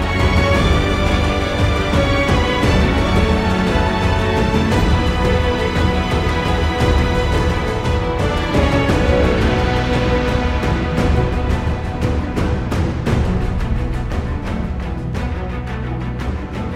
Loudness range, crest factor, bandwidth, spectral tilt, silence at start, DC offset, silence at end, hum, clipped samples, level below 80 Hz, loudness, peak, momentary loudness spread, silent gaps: 5 LU; 14 dB; 13 kHz; -6.5 dB/octave; 0 s; under 0.1%; 0 s; none; under 0.1%; -22 dBFS; -17 LUFS; -2 dBFS; 8 LU; none